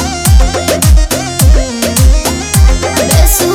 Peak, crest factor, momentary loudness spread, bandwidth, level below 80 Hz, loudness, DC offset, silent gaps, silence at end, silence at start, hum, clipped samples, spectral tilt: 0 dBFS; 8 dB; 4 LU; 18 kHz; -10 dBFS; -10 LUFS; under 0.1%; none; 0 s; 0 s; none; 1%; -4.5 dB/octave